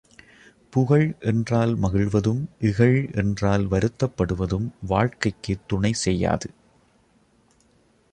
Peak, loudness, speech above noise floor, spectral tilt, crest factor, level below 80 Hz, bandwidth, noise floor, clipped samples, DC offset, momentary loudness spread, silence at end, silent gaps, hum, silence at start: -4 dBFS; -23 LUFS; 39 dB; -6.5 dB/octave; 18 dB; -42 dBFS; 9.8 kHz; -61 dBFS; under 0.1%; under 0.1%; 7 LU; 1.65 s; none; none; 0.7 s